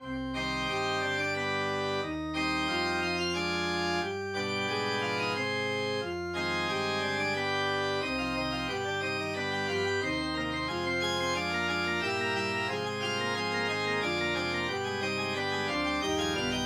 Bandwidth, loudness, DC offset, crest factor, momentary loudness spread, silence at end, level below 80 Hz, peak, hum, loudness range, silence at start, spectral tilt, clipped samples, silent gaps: 17.5 kHz; -30 LUFS; under 0.1%; 14 dB; 3 LU; 0 s; -54 dBFS; -18 dBFS; none; 1 LU; 0 s; -4 dB/octave; under 0.1%; none